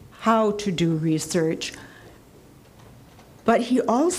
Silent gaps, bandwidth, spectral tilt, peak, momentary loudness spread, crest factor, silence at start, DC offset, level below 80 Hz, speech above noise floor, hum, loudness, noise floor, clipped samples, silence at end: none; 15.5 kHz; -5.5 dB/octave; -6 dBFS; 9 LU; 18 dB; 0.2 s; under 0.1%; -56 dBFS; 28 dB; none; -23 LUFS; -50 dBFS; under 0.1%; 0 s